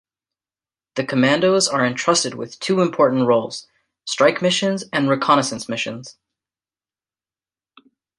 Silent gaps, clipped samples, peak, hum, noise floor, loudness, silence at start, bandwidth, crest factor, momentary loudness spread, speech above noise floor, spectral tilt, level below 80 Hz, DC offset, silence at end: none; under 0.1%; -2 dBFS; none; under -90 dBFS; -18 LUFS; 0.95 s; 11.5 kHz; 20 dB; 12 LU; over 71 dB; -4 dB/octave; -66 dBFS; under 0.1%; 2.1 s